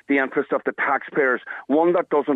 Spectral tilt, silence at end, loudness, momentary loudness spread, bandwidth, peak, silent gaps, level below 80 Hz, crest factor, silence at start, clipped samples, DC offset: -8 dB/octave; 0 s; -21 LUFS; 4 LU; 4 kHz; -8 dBFS; none; -80 dBFS; 14 dB; 0.1 s; under 0.1%; under 0.1%